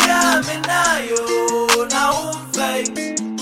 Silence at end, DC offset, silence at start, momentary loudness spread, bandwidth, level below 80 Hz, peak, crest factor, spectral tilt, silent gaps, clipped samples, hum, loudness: 0 s; under 0.1%; 0 s; 7 LU; 16.5 kHz; -50 dBFS; 0 dBFS; 18 dB; -2 dB/octave; none; under 0.1%; none; -18 LUFS